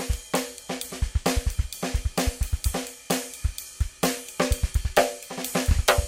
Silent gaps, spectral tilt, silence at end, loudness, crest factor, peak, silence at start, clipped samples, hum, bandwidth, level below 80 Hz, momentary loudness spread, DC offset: none; -4 dB/octave; 0 s; -27 LUFS; 24 dB; -2 dBFS; 0 s; under 0.1%; none; 17 kHz; -30 dBFS; 9 LU; under 0.1%